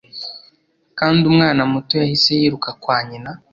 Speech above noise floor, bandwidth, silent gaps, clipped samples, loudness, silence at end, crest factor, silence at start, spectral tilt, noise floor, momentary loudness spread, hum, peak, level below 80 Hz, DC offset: 41 dB; 7.4 kHz; none; under 0.1%; -16 LUFS; 0.15 s; 16 dB; 0.15 s; -6 dB/octave; -57 dBFS; 17 LU; none; -2 dBFS; -54 dBFS; under 0.1%